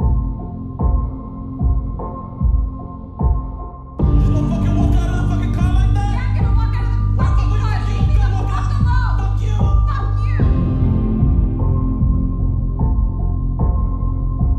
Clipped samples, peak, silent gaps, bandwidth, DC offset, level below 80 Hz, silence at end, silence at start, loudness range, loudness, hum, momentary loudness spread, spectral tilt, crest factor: under 0.1%; -4 dBFS; none; 6.6 kHz; under 0.1%; -18 dBFS; 0 s; 0 s; 4 LU; -19 LUFS; none; 9 LU; -8.5 dB/octave; 12 dB